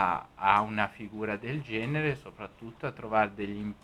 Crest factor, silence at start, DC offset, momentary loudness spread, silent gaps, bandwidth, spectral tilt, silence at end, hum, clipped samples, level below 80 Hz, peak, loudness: 24 dB; 0 s; under 0.1%; 13 LU; none; 12.5 kHz; -7 dB/octave; 0.1 s; none; under 0.1%; -60 dBFS; -8 dBFS; -31 LUFS